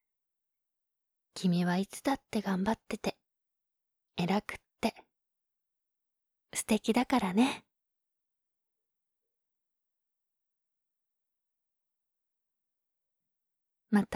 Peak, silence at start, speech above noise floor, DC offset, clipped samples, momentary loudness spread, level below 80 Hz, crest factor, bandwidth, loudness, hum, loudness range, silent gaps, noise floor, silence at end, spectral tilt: -16 dBFS; 1.35 s; 56 dB; under 0.1%; under 0.1%; 10 LU; -68 dBFS; 22 dB; 16 kHz; -32 LUFS; none; 6 LU; none; -87 dBFS; 0 s; -5.5 dB/octave